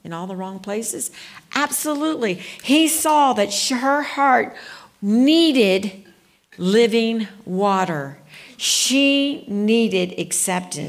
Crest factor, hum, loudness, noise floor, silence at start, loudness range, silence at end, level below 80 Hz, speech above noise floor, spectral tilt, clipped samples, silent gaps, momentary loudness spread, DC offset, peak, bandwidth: 16 dB; none; -19 LUFS; -52 dBFS; 0.05 s; 3 LU; 0 s; -68 dBFS; 33 dB; -3 dB/octave; under 0.1%; none; 13 LU; under 0.1%; -4 dBFS; 16 kHz